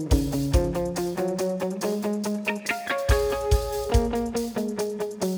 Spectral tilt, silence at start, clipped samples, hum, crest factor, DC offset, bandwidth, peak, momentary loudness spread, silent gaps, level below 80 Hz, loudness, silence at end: -5.5 dB/octave; 0 s; under 0.1%; none; 18 dB; under 0.1%; over 20 kHz; -8 dBFS; 5 LU; none; -30 dBFS; -26 LUFS; 0 s